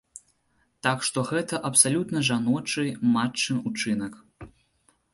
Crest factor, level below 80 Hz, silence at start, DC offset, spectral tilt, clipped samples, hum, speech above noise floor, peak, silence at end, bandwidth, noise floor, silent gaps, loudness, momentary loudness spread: 24 dB; -62 dBFS; 0.15 s; under 0.1%; -3.5 dB/octave; under 0.1%; none; 44 dB; -2 dBFS; 0.65 s; 11.5 kHz; -69 dBFS; none; -24 LUFS; 9 LU